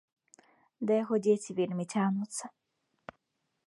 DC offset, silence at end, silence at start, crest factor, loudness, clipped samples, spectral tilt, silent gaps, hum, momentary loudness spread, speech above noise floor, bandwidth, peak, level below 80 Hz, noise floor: under 0.1%; 1.15 s; 0.8 s; 18 dB; -31 LUFS; under 0.1%; -6 dB/octave; none; none; 24 LU; 52 dB; 11.5 kHz; -14 dBFS; -80 dBFS; -82 dBFS